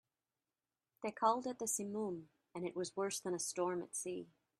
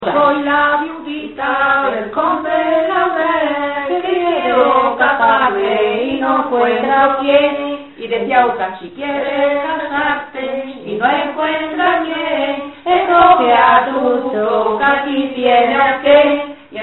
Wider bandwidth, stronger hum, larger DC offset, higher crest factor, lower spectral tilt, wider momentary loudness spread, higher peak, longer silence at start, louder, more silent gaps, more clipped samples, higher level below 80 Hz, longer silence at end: first, 14 kHz vs 4.2 kHz; neither; second, under 0.1% vs 0.2%; first, 22 dB vs 14 dB; second, -3.5 dB/octave vs -7 dB/octave; about the same, 11 LU vs 12 LU; second, -20 dBFS vs 0 dBFS; first, 1 s vs 0 s; second, -40 LUFS vs -14 LUFS; neither; neither; second, -84 dBFS vs -50 dBFS; first, 0.35 s vs 0 s